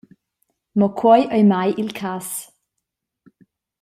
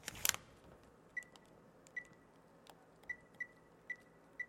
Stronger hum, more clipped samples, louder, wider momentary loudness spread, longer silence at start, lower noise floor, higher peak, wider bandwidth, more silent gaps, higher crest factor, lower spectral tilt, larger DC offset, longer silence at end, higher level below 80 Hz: neither; neither; first, -18 LUFS vs -45 LUFS; second, 13 LU vs 26 LU; first, 0.75 s vs 0 s; first, -79 dBFS vs -65 dBFS; first, -2 dBFS vs -10 dBFS; about the same, 15.5 kHz vs 16.5 kHz; neither; second, 18 dB vs 40 dB; first, -6 dB/octave vs 0 dB/octave; neither; first, 1.35 s vs 0 s; first, -64 dBFS vs -74 dBFS